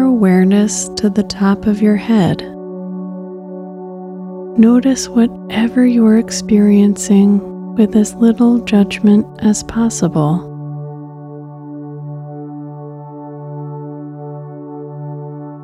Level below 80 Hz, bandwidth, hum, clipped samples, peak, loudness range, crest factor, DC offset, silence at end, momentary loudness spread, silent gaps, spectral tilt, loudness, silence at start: -46 dBFS; 12.5 kHz; none; under 0.1%; 0 dBFS; 17 LU; 14 dB; under 0.1%; 0 s; 19 LU; none; -6 dB/octave; -13 LUFS; 0 s